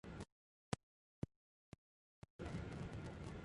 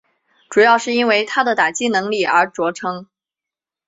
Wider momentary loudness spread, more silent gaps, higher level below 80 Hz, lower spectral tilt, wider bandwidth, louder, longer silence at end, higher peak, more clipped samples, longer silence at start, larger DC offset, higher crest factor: first, 17 LU vs 10 LU; first, 0.32-0.72 s, 0.83-1.22 s, 1.36-1.72 s, 1.78-2.22 s, 2.30-2.39 s vs none; about the same, -62 dBFS vs -66 dBFS; first, -6 dB/octave vs -3 dB/octave; first, 11.5 kHz vs 8 kHz; second, -51 LUFS vs -16 LUFS; second, 0 s vs 0.85 s; second, -22 dBFS vs -2 dBFS; neither; second, 0.05 s vs 0.5 s; neither; first, 30 dB vs 16 dB